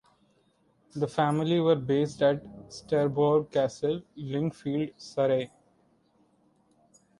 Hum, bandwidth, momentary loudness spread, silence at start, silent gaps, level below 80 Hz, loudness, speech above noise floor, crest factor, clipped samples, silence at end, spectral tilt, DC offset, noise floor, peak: none; 11.5 kHz; 10 LU; 0.95 s; none; -66 dBFS; -28 LUFS; 40 dB; 18 dB; under 0.1%; 1.75 s; -7 dB/octave; under 0.1%; -68 dBFS; -10 dBFS